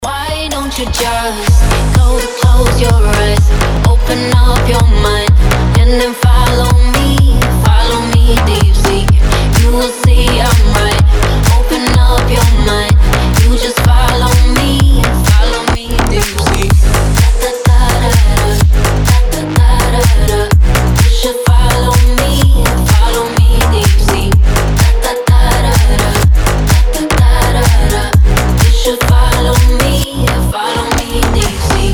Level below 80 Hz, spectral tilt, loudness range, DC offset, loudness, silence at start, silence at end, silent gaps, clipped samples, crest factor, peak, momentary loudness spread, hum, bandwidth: -10 dBFS; -5 dB/octave; 1 LU; under 0.1%; -10 LUFS; 0 s; 0 s; none; under 0.1%; 8 dB; 0 dBFS; 3 LU; none; 19.5 kHz